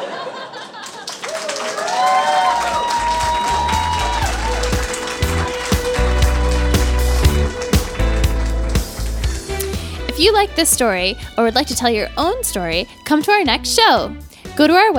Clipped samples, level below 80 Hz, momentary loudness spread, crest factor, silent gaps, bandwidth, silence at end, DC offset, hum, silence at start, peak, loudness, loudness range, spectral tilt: under 0.1%; -24 dBFS; 11 LU; 16 dB; none; 18.5 kHz; 0 s; under 0.1%; none; 0 s; 0 dBFS; -17 LUFS; 3 LU; -4 dB/octave